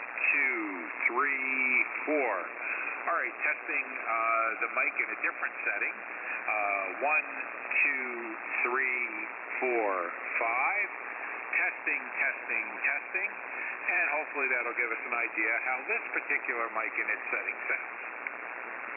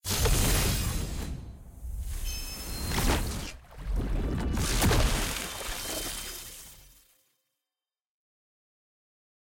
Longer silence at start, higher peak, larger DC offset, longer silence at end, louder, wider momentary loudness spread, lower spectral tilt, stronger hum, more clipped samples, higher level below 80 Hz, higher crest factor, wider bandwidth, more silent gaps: about the same, 0 s vs 0.05 s; about the same, -14 dBFS vs -14 dBFS; neither; second, 0 s vs 2.65 s; about the same, -30 LUFS vs -30 LUFS; second, 9 LU vs 17 LU; first, -6.5 dB/octave vs -3.5 dB/octave; neither; neither; second, under -90 dBFS vs -34 dBFS; about the same, 18 dB vs 16 dB; second, 3.1 kHz vs 17 kHz; neither